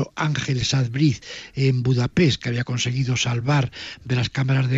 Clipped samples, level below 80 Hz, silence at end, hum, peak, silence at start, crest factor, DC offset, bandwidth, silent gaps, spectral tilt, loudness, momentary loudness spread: under 0.1%; -48 dBFS; 0 s; none; -6 dBFS; 0 s; 16 dB; under 0.1%; 7.8 kHz; none; -5.5 dB/octave; -22 LUFS; 6 LU